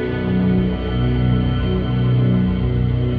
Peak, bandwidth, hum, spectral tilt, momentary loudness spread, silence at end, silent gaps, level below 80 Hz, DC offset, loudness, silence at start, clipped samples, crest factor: -6 dBFS; 4.8 kHz; 60 Hz at -35 dBFS; -10.5 dB/octave; 3 LU; 0 s; none; -26 dBFS; under 0.1%; -18 LUFS; 0 s; under 0.1%; 10 dB